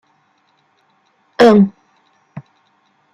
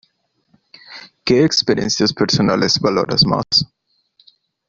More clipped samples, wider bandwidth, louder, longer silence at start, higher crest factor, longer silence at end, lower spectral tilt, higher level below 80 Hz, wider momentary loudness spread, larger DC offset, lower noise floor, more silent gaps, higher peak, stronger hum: neither; first, 9.8 kHz vs 7.6 kHz; first, -11 LUFS vs -15 LUFS; first, 1.4 s vs 0.9 s; about the same, 18 dB vs 16 dB; second, 0.75 s vs 1.05 s; first, -7 dB/octave vs -4.5 dB/octave; second, -62 dBFS vs -48 dBFS; first, 28 LU vs 16 LU; neither; second, -60 dBFS vs -65 dBFS; neither; about the same, 0 dBFS vs -2 dBFS; neither